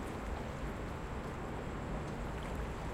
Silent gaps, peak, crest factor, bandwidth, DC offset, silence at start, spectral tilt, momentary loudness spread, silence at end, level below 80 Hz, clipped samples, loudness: none; -28 dBFS; 12 dB; 16 kHz; under 0.1%; 0 s; -6.5 dB/octave; 1 LU; 0 s; -46 dBFS; under 0.1%; -42 LUFS